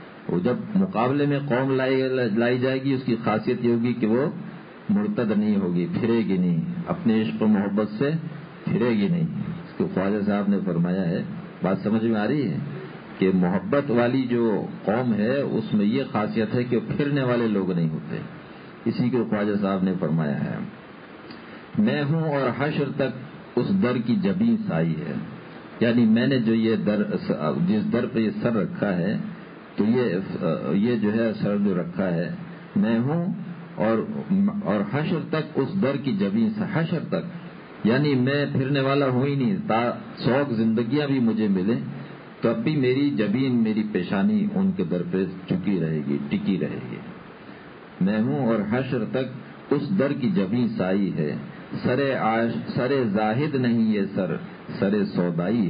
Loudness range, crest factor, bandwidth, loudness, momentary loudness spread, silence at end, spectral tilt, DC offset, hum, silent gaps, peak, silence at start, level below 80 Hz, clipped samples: 3 LU; 16 dB; 5.2 kHz; -24 LUFS; 11 LU; 0 s; -12 dB/octave; under 0.1%; none; none; -8 dBFS; 0 s; -58 dBFS; under 0.1%